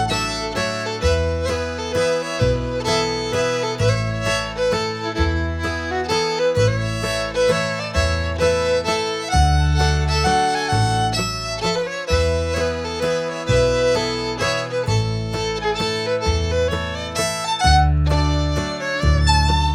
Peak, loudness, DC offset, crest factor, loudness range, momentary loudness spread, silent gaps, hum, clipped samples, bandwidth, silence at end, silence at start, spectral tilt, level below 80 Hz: -2 dBFS; -20 LUFS; under 0.1%; 16 dB; 2 LU; 6 LU; none; none; under 0.1%; 13 kHz; 0 s; 0 s; -4.5 dB/octave; -26 dBFS